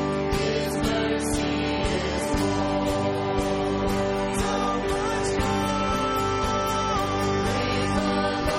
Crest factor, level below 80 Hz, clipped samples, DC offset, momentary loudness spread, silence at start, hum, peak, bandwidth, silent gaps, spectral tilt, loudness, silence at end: 14 dB; -38 dBFS; under 0.1%; under 0.1%; 1 LU; 0 s; none; -12 dBFS; 15.5 kHz; none; -5 dB/octave; -25 LUFS; 0 s